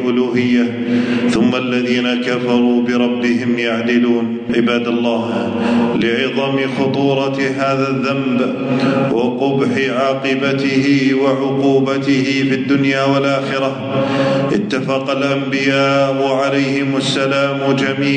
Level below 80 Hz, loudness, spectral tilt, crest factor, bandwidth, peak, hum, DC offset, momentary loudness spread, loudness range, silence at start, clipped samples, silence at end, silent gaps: -56 dBFS; -15 LUFS; -6 dB/octave; 12 dB; 9.4 kHz; -2 dBFS; none; under 0.1%; 3 LU; 1 LU; 0 s; under 0.1%; 0 s; none